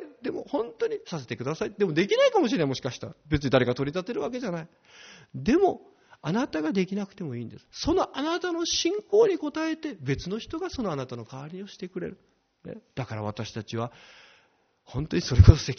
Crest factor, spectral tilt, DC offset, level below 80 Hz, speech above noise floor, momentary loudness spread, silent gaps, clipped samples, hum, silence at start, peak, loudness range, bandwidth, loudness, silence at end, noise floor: 26 dB; -6 dB/octave; under 0.1%; -38 dBFS; 39 dB; 16 LU; none; under 0.1%; none; 0 s; 0 dBFS; 10 LU; 6.6 kHz; -27 LUFS; 0.05 s; -66 dBFS